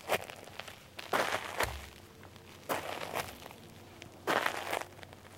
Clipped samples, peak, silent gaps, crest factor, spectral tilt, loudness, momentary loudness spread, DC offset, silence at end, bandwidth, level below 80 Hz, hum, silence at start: under 0.1%; -12 dBFS; none; 28 dB; -3 dB/octave; -37 LUFS; 20 LU; under 0.1%; 0 s; 16 kHz; -60 dBFS; none; 0 s